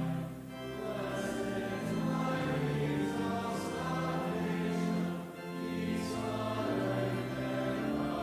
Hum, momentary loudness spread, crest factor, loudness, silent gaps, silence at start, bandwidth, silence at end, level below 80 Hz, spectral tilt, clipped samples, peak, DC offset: none; 6 LU; 14 dB; -35 LUFS; none; 0 s; 16 kHz; 0 s; -58 dBFS; -6.5 dB/octave; under 0.1%; -22 dBFS; under 0.1%